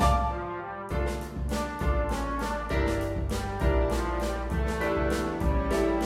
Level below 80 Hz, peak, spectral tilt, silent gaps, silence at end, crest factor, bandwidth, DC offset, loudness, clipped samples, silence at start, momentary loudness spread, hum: -32 dBFS; -10 dBFS; -6 dB/octave; none; 0 s; 16 dB; 15 kHz; under 0.1%; -29 LUFS; under 0.1%; 0 s; 6 LU; none